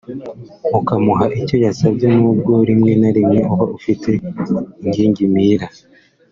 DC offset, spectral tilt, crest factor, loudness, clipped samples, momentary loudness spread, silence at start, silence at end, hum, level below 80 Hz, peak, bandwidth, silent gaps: under 0.1%; -8.5 dB/octave; 14 dB; -15 LUFS; under 0.1%; 8 LU; 0.1 s; 0.65 s; none; -48 dBFS; -2 dBFS; 7.4 kHz; none